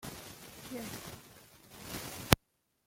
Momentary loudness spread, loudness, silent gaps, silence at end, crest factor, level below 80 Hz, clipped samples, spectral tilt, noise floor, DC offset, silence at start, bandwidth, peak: 23 LU; -36 LUFS; none; 0.5 s; 38 dB; -52 dBFS; under 0.1%; -4 dB/octave; -75 dBFS; under 0.1%; 0 s; 16.5 kHz; 0 dBFS